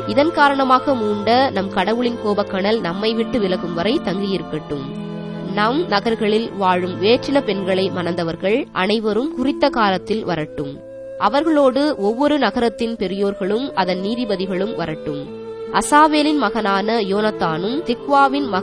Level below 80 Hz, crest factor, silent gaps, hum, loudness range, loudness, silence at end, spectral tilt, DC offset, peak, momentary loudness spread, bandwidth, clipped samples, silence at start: -50 dBFS; 18 dB; none; none; 3 LU; -18 LUFS; 0 s; -5.5 dB/octave; under 0.1%; 0 dBFS; 10 LU; 11 kHz; under 0.1%; 0 s